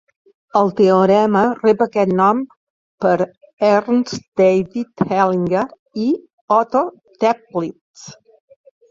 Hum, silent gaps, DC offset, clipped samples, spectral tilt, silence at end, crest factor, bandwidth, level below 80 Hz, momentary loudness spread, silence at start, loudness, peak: none; 2.57-2.98 s, 3.37-3.41 s, 3.53-3.57 s, 4.28-4.32 s, 5.79-5.86 s, 6.33-6.48 s, 7.81-7.94 s; under 0.1%; under 0.1%; -7 dB/octave; 0.75 s; 16 dB; 7.6 kHz; -58 dBFS; 11 LU; 0.55 s; -17 LUFS; -2 dBFS